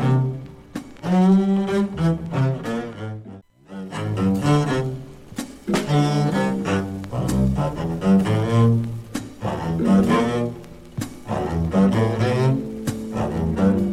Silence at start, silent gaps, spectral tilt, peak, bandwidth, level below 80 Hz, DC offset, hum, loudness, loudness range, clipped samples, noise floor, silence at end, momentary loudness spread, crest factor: 0 s; none; -7.5 dB/octave; -6 dBFS; 13.5 kHz; -40 dBFS; under 0.1%; none; -21 LUFS; 3 LU; under 0.1%; -42 dBFS; 0 s; 16 LU; 14 dB